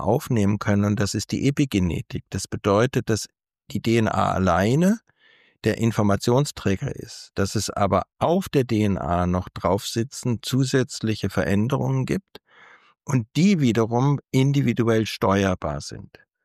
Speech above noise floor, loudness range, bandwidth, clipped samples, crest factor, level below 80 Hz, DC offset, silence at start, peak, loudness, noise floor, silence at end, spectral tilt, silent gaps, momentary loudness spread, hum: 36 dB; 2 LU; 15 kHz; under 0.1%; 16 dB; -48 dBFS; under 0.1%; 0 s; -8 dBFS; -23 LUFS; -58 dBFS; 0.4 s; -6 dB/octave; none; 9 LU; none